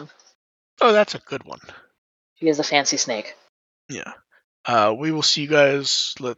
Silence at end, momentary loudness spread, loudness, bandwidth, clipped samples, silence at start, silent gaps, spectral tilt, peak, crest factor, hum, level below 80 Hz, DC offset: 0.05 s; 19 LU; -19 LUFS; 8.2 kHz; under 0.1%; 0 s; 0.35-0.77 s, 1.98-2.36 s, 3.49-3.89 s, 4.44-4.64 s; -2.5 dB/octave; -2 dBFS; 20 dB; none; -74 dBFS; under 0.1%